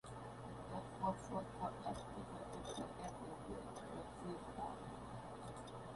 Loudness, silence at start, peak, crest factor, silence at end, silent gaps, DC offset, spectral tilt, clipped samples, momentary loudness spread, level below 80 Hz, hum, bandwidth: -49 LUFS; 0.05 s; -28 dBFS; 20 dB; 0 s; none; under 0.1%; -6 dB/octave; under 0.1%; 8 LU; -64 dBFS; none; 11.5 kHz